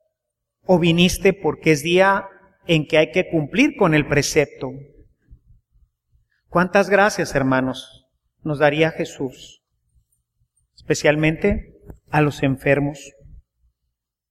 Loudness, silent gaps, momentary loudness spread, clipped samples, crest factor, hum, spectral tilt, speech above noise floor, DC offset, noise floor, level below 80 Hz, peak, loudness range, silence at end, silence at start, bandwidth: -19 LUFS; none; 15 LU; under 0.1%; 18 dB; none; -5.5 dB/octave; 62 dB; under 0.1%; -80 dBFS; -44 dBFS; -2 dBFS; 5 LU; 1.2 s; 0.7 s; 15 kHz